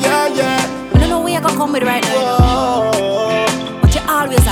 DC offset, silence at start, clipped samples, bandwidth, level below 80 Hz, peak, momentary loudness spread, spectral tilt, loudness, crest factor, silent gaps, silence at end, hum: under 0.1%; 0 s; under 0.1%; 18 kHz; -22 dBFS; 0 dBFS; 3 LU; -5 dB/octave; -14 LUFS; 14 dB; none; 0 s; none